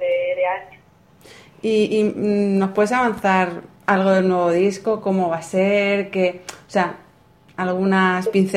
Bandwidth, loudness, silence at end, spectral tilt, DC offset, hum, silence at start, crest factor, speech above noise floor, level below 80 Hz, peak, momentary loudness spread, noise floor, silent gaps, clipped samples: 12.5 kHz; -19 LUFS; 0 s; -6.5 dB/octave; under 0.1%; none; 0 s; 18 dB; 33 dB; -60 dBFS; -2 dBFS; 8 LU; -52 dBFS; none; under 0.1%